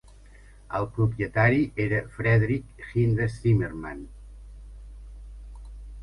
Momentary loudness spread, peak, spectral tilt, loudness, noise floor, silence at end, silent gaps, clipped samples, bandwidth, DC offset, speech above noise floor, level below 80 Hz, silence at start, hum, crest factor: 24 LU; -6 dBFS; -9 dB/octave; -25 LUFS; -50 dBFS; 0 s; none; under 0.1%; 10.5 kHz; under 0.1%; 25 dB; -44 dBFS; 0.7 s; 50 Hz at -45 dBFS; 20 dB